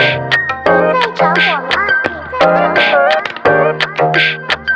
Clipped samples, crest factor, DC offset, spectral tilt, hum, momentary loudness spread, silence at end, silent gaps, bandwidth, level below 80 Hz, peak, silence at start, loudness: under 0.1%; 12 dB; under 0.1%; -5 dB/octave; none; 4 LU; 0 s; none; 9.4 kHz; -48 dBFS; 0 dBFS; 0 s; -12 LUFS